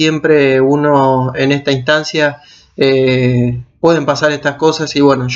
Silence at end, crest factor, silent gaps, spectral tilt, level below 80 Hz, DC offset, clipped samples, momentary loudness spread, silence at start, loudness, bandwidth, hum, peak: 0 s; 12 dB; none; -6 dB/octave; -46 dBFS; under 0.1%; under 0.1%; 5 LU; 0 s; -12 LUFS; 7.8 kHz; none; 0 dBFS